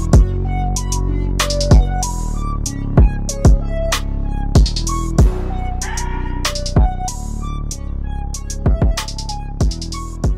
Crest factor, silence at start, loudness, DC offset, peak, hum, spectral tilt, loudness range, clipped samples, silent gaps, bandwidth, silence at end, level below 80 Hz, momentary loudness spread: 12 dB; 0 s; -19 LUFS; under 0.1%; -2 dBFS; none; -5 dB/octave; 5 LU; under 0.1%; none; 15 kHz; 0 s; -18 dBFS; 12 LU